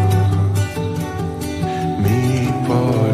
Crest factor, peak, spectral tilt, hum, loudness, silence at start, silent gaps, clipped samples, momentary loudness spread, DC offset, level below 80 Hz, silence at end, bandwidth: 12 dB; -6 dBFS; -7 dB/octave; none; -19 LUFS; 0 s; none; under 0.1%; 7 LU; under 0.1%; -38 dBFS; 0 s; 14.5 kHz